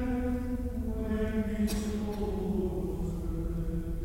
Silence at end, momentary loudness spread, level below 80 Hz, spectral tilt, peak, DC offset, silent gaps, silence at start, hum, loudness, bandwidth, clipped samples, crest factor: 0 s; 4 LU; -36 dBFS; -7 dB/octave; -20 dBFS; under 0.1%; none; 0 s; none; -33 LUFS; 16 kHz; under 0.1%; 12 dB